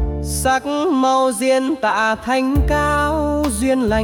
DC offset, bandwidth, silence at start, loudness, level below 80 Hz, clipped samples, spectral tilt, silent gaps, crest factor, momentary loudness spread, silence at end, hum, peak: under 0.1%; 18 kHz; 0 s; -17 LUFS; -28 dBFS; under 0.1%; -5 dB/octave; none; 12 dB; 3 LU; 0 s; none; -4 dBFS